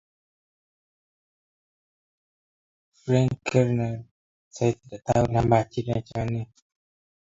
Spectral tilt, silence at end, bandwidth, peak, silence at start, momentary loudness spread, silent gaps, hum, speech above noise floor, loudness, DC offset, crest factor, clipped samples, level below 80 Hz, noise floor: -7.5 dB/octave; 0.85 s; 7.8 kHz; -6 dBFS; 3.05 s; 12 LU; 4.11-4.51 s; none; over 66 dB; -25 LUFS; under 0.1%; 22 dB; under 0.1%; -50 dBFS; under -90 dBFS